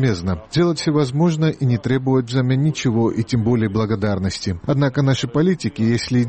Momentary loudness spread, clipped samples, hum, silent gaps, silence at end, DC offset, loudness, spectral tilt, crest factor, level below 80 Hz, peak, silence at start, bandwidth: 4 LU; under 0.1%; none; none; 0 s; 0.1%; -19 LUFS; -6.5 dB/octave; 12 dB; -46 dBFS; -6 dBFS; 0 s; 8.8 kHz